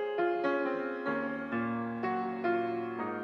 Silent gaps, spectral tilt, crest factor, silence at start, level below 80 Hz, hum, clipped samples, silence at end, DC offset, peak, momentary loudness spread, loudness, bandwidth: none; -8 dB/octave; 16 dB; 0 s; -76 dBFS; none; under 0.1%; 0 s; under 0.1%; -18 dBFS; 4 LU; -33 LUFS; 6.2 kHz